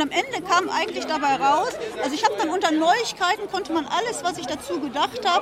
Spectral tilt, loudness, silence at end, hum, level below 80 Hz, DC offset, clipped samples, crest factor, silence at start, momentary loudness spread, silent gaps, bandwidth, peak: -2.5 dB/octave; -23 LUFS; 0 s; none; -60 dBFS; under 0.1%; under 0.1%; 16 dB; 0 s; 8 LU; none; 16 kHz; -6 dBFS